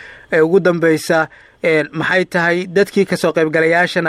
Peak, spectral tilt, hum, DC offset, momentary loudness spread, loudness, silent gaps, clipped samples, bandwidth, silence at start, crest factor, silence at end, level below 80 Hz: -2 dBFS; -5.5 dB/octave; none; under 0.1%; 4 LU; -15 LUFS; none; under 0.1%; 14.5 kHz; 0 s; 12 dB; 0 s; -56 dBFS